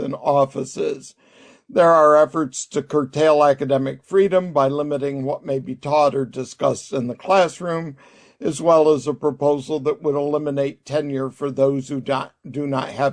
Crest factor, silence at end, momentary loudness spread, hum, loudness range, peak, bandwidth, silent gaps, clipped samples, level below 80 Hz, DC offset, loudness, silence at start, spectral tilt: 16 dB; 0 s; 11 LU; none; 5 LU; -2 dBFS; 10.5 kHz; none; under 0.1%; -62 dBFS; under 0.1%; -20 LUFS; 0 s; -6 dB/octave